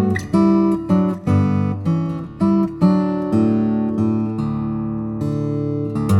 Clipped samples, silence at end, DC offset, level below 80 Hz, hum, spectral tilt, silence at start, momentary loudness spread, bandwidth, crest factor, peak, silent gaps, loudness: under 0.1%; 0 s; under 0.1%; -46 dBFS; none; -9 dB/octave; 0 s; 7 LU; 11.5 kHz; 14 dB; -4 dBFS; none; -19 LUFS